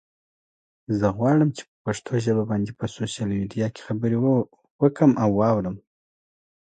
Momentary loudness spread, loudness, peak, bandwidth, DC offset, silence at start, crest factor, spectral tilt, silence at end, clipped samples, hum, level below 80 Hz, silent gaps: 11 LU; -23 LUFS; -6 dBFS; 9.4 kHz; under 0.1%; 0.9 s; 18 dB; -7.5 dB/octave; 0.85 s; under 0.1%; none; -54 dBFS; 1.68-1.85 s, 4.71-4.79 s